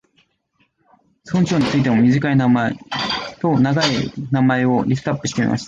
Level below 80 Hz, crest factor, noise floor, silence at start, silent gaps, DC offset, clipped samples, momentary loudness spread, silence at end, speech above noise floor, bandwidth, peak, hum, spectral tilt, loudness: -50 dBFS; 14 dB; -64 dBFS; 1.25 s; none; under 0.1%; under 0.1%; 7 LU; 0 s; 48 dB; 7.8 kHz; -4 dBFS; none; -6 dB/octave; -18 LUFS